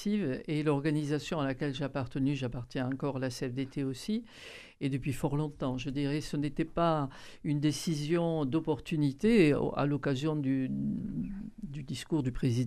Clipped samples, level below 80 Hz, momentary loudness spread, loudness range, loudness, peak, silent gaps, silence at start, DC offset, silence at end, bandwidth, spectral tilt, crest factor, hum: under 0.1%; -52 dBFS; 8 LU; 5 LU; -32 LUFS; -12 dBFS; none; 0 s; under 0.1%; 0 s; 13.5 kHz; -6.5 dB/octave; 18 dB; none